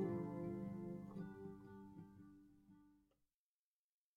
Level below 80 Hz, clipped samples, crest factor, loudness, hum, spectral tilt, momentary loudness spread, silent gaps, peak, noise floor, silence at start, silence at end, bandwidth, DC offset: -76 dBFS; under 0.1%; 20 dB; -51 LUFS; none; -10 dB/octave; 21 LU; none; -32 dBFS; under -90 dBFS; 0 s; 1.2 s; 13 kHz; under 0.1%